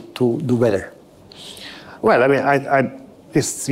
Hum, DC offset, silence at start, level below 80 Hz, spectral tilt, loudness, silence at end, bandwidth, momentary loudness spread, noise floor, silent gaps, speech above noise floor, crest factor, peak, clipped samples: none; under 0.1%; 0 s; -56 dBFS; -5 dB/octave; -18 LUFS; 0 s; 16 kHz; 20 LU; -42 dBFS; none; 25 dB; 14 dB; -6 dBFS; under 0.1%